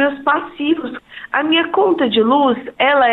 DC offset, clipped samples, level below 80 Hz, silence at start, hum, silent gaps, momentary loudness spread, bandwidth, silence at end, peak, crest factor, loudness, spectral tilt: under 0.1%; under 0.1%; -58 dBFS; 0 s; none; none; 8 LU; 4.3 kHz; 0 s; -2 dBFS; 12 dB; -16 LUFS; -7 dB/octave